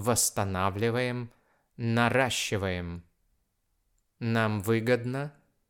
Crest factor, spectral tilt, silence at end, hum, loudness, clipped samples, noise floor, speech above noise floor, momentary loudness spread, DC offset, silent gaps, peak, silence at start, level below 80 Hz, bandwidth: 20 dB; -4.5 dB/octave; 0.4 s; none; -28 LUFS; under 0.1%; -75 dBFS; 47 dB; 13 LU; under 0.1%; none; -10 dBFS; 0 s; -62 dBFS; 18 kHz